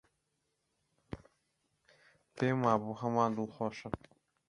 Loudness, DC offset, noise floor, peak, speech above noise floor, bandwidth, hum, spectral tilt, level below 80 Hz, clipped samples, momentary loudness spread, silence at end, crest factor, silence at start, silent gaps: -34 LUFS; under 0.1%; -82 dBFS; -14 dBFS; 49 dB; 11 kHz; none; -7.5 dB/octave; -66 dBFS; under 0.1%; 19 LU; 0.55 s; 24 dB; 1.1 s; none